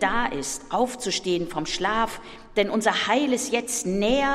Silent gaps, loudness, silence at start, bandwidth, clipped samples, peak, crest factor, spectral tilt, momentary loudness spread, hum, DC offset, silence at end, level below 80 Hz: none; -25 LUFS; 0 s; 16 kHz; under 0.1%; -6 dBFS; 18 dB; -3 dB/octave; 6 LU; none; under 0.1%; 0 s; -46 dBFS